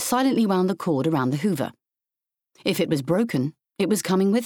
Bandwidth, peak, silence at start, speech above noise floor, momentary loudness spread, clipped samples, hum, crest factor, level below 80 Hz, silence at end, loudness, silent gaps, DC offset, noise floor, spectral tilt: 19.5 kHz; -8 dBFS; 0 s; 65 dB; 8 LU; under 0.1%; none; 14 dB; -66 dBFS; 0 s; -23 LUFS; none; under 0.1%; -87 dBFS; -5.5 dB/octave